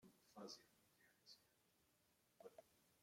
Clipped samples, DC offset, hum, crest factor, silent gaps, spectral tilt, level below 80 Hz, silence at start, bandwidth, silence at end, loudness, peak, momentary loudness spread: under 0.1%; under 0.1%; none; 22 dB; none; -3 dB/octave; under -90 dBFS; 0 s; 16 kHz; 0 s; -63 LUFS; -44 dBFS; 9 LU